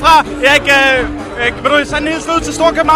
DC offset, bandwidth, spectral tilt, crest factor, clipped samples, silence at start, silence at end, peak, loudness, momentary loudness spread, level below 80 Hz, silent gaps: under 0.1%; 16.5 kHz; -3 dB/octave; 12 dB; 0.4%; 0 s; 0 s; 0 dBFS; -11 LUFS; 8 LU; -32 dBFS; none